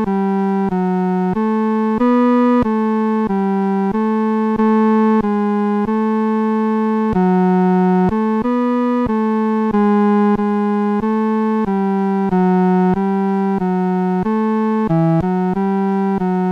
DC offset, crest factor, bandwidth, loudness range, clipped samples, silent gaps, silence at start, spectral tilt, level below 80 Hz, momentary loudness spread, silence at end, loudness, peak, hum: under 0.1%; 10 dB; 5.6 kHz; 1 LU; under 0.1%; none; 0 s; -10 dB/octave; -46 dBFS; 4 LU; 0 s; -16 LUFS; -6 dBFS; none